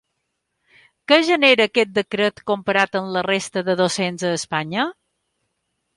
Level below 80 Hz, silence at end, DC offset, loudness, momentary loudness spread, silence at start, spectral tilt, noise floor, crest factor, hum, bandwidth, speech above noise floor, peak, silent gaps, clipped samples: -64 dBFS; 1.05 s; under 0.1%; -19 LUFS; 10 LU; 1.1 s; -4 dB/octave; -75 dBFS; 18 dB; none; 11.5 kHz; 56 dB; -2 dBFS; none; under 0.1%